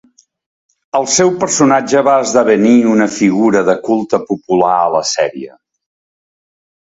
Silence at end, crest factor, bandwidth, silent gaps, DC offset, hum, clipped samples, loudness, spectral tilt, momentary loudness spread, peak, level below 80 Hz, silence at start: 1.45 s; 14 dB; 8 kHz; none; under 0.1%; none; under 0.1%; -12 LUFS; -4 dB/octave; 8 LU; 0 dBFS; -56 dBFS; 0.95 s